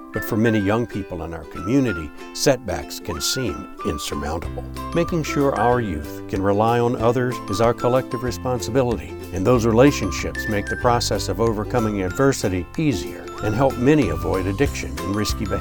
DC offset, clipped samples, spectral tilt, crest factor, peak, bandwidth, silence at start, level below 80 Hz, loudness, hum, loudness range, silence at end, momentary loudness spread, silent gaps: under 0.1%; under 0.1%; -5.5 dB/octave; 18 dB; -2 dBFS; 19.5 kHz; 0 s; -36 dBFS; -21 LUFS; none; 4 LU; 0 s; 10 LU; none